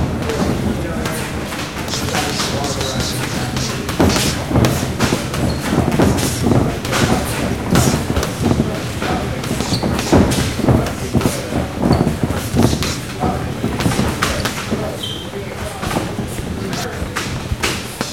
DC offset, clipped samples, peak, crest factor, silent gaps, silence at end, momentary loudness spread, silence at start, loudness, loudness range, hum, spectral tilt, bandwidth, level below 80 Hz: 0.4%; under 0.1%; 0 dBFS; 18 dB; none; 0 s; 8 LU; 0 s; -18 LUFS; 4 LU; none; -5 dB/octave; 17 kHz; -32 dBFS